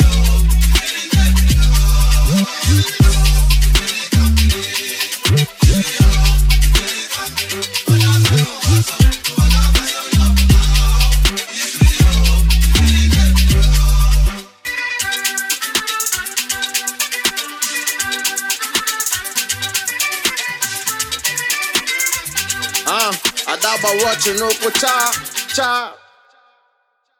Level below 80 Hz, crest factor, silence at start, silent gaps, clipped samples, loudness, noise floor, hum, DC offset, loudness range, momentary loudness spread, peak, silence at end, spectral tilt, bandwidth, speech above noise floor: -16 dBFS; 14 dB; 0 s; none; under 0.1%; -15 LUFS; -64 dBFS; none; under 0.1%; 4 LU; 6 LU; 0 dBFS; 1.25 s; -3.5 dB/octave; 18 kHz; 48 dB